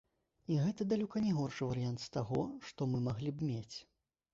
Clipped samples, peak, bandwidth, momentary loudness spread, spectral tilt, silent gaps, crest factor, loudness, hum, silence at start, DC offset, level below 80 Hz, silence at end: under 0.1%; -22 dBFS; 7.6 kHz; 9 LU; -7.5 dB/octave; none; 14 dB; -37 LUFS; none; 0.5 s; under 0.1%; -66 dBFS; 0.5 s